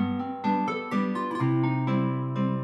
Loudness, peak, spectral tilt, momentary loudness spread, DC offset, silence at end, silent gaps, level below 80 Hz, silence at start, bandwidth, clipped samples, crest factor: -27 LUFS; -14 dBFS; -8.5 dB/octave; 3 LU; under 0.1%; 0 s; none; -80 dBFS; 0 s; 8.8 kHz; under 0.1%; 12 dB